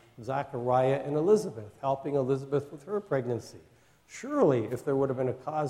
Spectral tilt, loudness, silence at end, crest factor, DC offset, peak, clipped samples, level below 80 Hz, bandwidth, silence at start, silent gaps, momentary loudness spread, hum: -7.5 dB/octave; -29 LUFS; 0 s; 18 dB; under 0.1%; -12 dBFS; under 0.1%; -66 dBFS; 13 kHz; 0.2 s; none; 10 LU; none